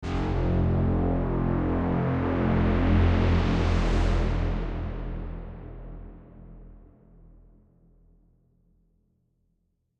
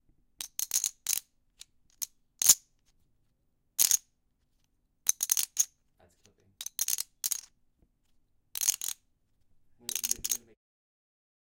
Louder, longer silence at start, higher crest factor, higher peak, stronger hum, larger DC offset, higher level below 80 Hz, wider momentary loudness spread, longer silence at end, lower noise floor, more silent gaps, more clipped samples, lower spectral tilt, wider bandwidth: first, -26 LUFS vs -29 LUFS; second, 0 s vs 0.4 s; second, 16 dB vs 30 dB; second, -12 dBFS vs -4 dBFS; neither; neither; first, -32 dBFS vs -70 dBFS; first, 19 LU vs 15 LU; first, 3.2 s vs 1.15 s; about the same, -73 dBFS vs -74 dBFS; neither; neither; first, -8.5 dB/octave vs 3 dB/octave; second, 7.8 kHz vs 17 kHz